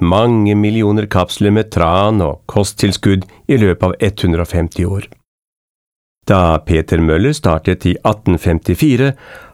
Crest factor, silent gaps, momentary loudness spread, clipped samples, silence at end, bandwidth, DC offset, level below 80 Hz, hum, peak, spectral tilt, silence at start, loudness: 14 dB; 5.28-5.38 s, 5.47-6.15 s; 5 LU; under 0.1%; 0.1 s; 15.5 kHz; 0.4%; -30 dBFS; none; 0 dBFS; -6.5 dB/octave; 0 s; -14 LUFS